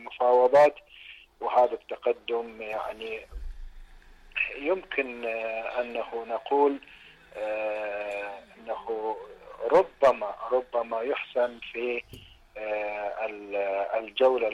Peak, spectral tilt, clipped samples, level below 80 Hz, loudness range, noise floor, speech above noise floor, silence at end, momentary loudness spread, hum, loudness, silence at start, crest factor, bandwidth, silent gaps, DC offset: -12 dBFS; -5 dB/octave; under 0.1%; -52 dBFS; 5 LU; -51 dBFS; 24 dB; 0 s; 16 LU; none; -28 LUFS; 0 s; 16 dB; 11 kHz; none; under 0.1%